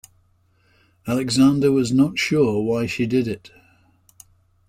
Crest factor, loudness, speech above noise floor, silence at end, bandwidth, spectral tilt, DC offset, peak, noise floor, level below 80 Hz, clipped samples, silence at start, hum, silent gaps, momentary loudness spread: 16 dB; -20 LUFS; 42 dB; 1.3 s; 15.5 kHz; -5.5 dB/octave; under 0.1%; -6 dBFS; -61 dBFS; -54 dBFS; under 0.1%; 1.05 s; none; none; 11 LU